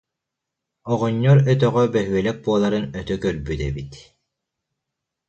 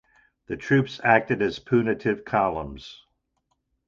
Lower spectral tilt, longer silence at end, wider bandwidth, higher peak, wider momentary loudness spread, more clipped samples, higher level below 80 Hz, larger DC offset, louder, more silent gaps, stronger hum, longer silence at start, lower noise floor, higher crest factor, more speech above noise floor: about the same, -7.5 dB/octave vs -7 dB/octave; first, 1.3 s vs 0.9 s; about the same, 8 kHz vs 7.6 kHz; about the same, -4 dBFS vs -2 dBFS; second, 12 LU vs 16 LU; neither; first, -42 dBFS vs -52 dBFS; neither; first, -20 LUFS vs -23 LUFS; neither; neither; first, 0.85 s vs 0.5 s; first, -83 dBFS vs -75 dBFS; about the same, 18 dB vs 22 dB; first, 63 dB vs 51 dB